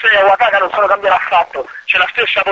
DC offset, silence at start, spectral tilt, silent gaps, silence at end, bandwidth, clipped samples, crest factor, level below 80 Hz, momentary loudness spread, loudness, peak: under 0.1%; 0 s; -3 dB/octave; none; 0 s; 7.6 kHz; under 0.1%; 12 dB; -52 dBFS; 5 LU; -12 LUFS; 0 dBFS